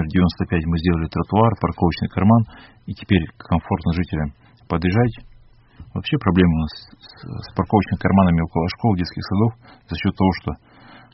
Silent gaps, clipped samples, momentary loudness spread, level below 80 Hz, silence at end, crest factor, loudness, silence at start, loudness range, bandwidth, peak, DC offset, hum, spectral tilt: none; under 0.1%; 15 LU; -38 dBFS; 0.6 s; 20 dB; -20 LUFS; 0 s; 3 LU; 5.8 kHz; 0 dBFS; under 0.1%; none; -6.5 dB/octave